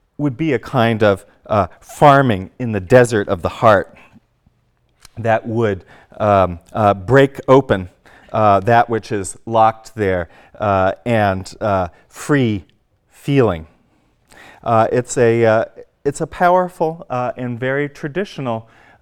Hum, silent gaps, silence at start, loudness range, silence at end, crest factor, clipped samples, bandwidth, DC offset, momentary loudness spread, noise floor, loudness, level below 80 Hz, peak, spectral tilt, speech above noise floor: none; none; 0.2 s; 4 LU; 0.4 s; 16 dB; under 0.1%; 16.5 kHz; under 0.1%; 12 LU; -61 dBFS; -16 LUFS; -46 dBFS; 0 dBFS; -6.5 dB/octave; 45 dB